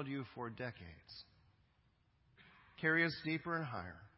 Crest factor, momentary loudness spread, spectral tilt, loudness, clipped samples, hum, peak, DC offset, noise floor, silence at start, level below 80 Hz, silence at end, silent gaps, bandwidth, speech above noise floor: 22 dB; 22 LU; -4 dB/octave; -39 LUFS; under 0.1%; none; -22 dBFS; under 0.1%; -75 dBFS; 0 s; -70 dBFS; 0.1 s; none; 5.6 kHz; 34 dB